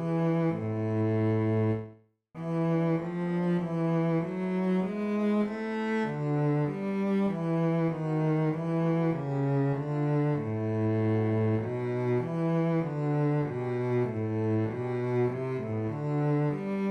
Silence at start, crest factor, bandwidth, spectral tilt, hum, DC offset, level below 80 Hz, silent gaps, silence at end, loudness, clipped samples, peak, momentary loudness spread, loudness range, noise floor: 0 s; 10 dB; 8.2 kHz; -9.5 dB/octave; none; under 0.1%; -66 dBFS; none; 0 s; -29 LUFS; under 0.1%; -18 dBFS; 4 LU; 1 LU; -53 dBFS